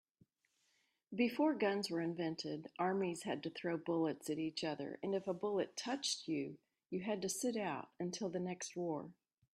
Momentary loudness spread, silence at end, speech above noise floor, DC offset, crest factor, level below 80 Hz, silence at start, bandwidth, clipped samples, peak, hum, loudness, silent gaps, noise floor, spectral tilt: 7 LU; 0.45 s; 41 dB; under 0.1%; 18 dB; -84 dBFS; 1.1 s; 14.5 kHz; under 0.1%; -22 dBFS; none; -40 LUFS; none; -81 dBFS; -4.5 dB/octave